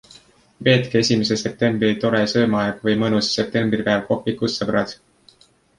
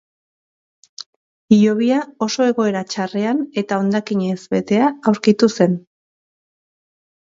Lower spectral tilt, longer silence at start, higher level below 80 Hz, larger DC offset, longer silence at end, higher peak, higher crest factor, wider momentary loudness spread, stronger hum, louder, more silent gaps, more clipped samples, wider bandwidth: about the same, -5 dB/octave vs -6 dB/octave; second, 0.6 s vs 1 s; first, -54 dBFS vs -64 dBFS; neither; second, 0.85 s vs 1.6 s; about the same, -2 dBFS vs 0 dBFS; about the same, 18 dB vs 18 dB; second, 5 LU vs 9 LU; neither; about the same, -20 LUFS vs -18 LUFS; second, none vs 1.06-1.48 s; neither; first, 11 kHz vs 7.8 kHz